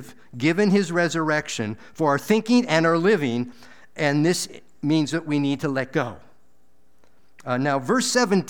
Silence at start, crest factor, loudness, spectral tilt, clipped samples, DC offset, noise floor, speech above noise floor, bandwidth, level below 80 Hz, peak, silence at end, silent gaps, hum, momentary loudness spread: 0 s; 18 dB; -22 LUFS; -5 dB/octave; under 0.1%; 0.5%; -65 dBFS; 43 dB; 20 kHz; -66 dBFS; -4 dBFS; 0 s; none; none; 12 LU